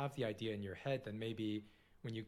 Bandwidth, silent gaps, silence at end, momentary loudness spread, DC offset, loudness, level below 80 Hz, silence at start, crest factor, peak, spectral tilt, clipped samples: 15 kHz; none; 0 s; 6 LU; under 0.1%; -44 LUFS; -72 dBFS; 0 s; 16 dB; -26 dBFS; -7 dB/octave; under 0.1%